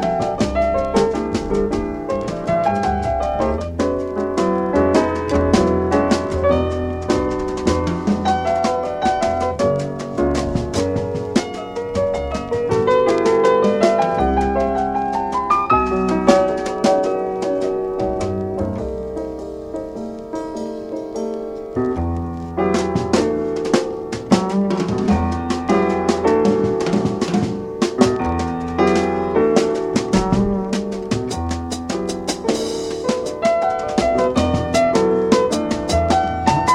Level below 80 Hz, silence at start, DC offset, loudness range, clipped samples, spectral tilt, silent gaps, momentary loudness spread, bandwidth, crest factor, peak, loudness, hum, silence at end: -34 dBFS; 0 s; under 0.1%; 5 LU; under 0.1%; -6 dB/octave; none; 9 LU; 13 kHz; 18 dB; 0 dBFS; -19 LUFS; none; 0 s